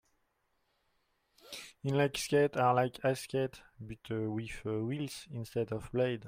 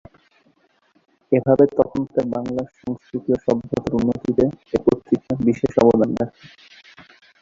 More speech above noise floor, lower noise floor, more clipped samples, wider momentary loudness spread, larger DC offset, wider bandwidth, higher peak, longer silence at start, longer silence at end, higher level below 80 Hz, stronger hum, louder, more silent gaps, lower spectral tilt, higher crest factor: about the same, 44 dB vs 42 dB; first, -78 dBFS vs -61 dBFS; neither; first, 18 LU vs 12 LU; neither; first, 16 kHz vs 7.6 kHz; second, -16 dBFS vs 0 dBFS; first, 1.45 s vs 1.3 s; second, 0 s vs 0.4 s; second, -62 dBFS vs -48 dBFS; neither; second, -34 LUFS vs -20 LUFS; neither; second, -5.5 dB/octave vs -8.5 dB/octave; about the same, 18 dB vs 20 dB